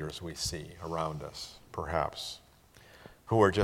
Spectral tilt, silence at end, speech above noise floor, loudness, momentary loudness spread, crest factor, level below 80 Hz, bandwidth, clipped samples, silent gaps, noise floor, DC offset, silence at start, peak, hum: -5 dB/octave; 0 s; 26 dB; -34 LUFS; 20 LU; 24 dB; -54 dBFS; 16.5 kHz; under 0.1%; none; -58 dBFS; under 0.1%; 0 s; -10 dBFS; none